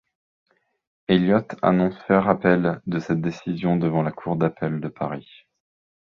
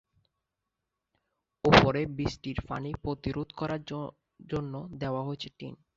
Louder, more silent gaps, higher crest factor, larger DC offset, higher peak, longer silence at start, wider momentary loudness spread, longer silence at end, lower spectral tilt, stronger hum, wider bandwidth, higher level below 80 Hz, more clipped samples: first, -22 LUFS vs -30 LUFS; neither; second, 20 dB vs 28 dB; neither; about the same, -2 dBFS vs -2 dBFS; second, 1.1 s vs 1.65 s; second, 10 LU vs 18 LU; first, 0.9 s vs 0.25 s; first, -8.5 dB/octave vs -6 dB/octave; neither; about the same, 7 kHz vs 7.6 kHz; second, -56 dBFS vs -50 dBFS; neither